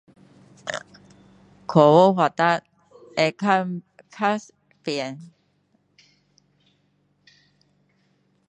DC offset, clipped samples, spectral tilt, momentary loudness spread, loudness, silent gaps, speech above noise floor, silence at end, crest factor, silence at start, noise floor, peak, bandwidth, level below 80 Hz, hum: under 0.1%; under 0.1%; -6 dB/octave; 20 LU; -21 LUFS; none; 47 dB; 3.25 s; 24 dB; 0.65 s; -66 dBFS; -2 dBFS; 9.6 kHz; -70 dBFS; none